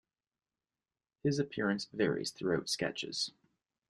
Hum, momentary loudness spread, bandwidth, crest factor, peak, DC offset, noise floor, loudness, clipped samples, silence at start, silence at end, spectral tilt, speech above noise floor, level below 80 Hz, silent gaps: none; 4 LU; 12.5 kHz; 20 dB; -18 dBFS; under 0.1%; under -90 dBFS; -35 LUFS; under 0.1%; 1.25 s; 0.6 s; -4.5 dB/octave; over 55 dB; -70 dBFS; none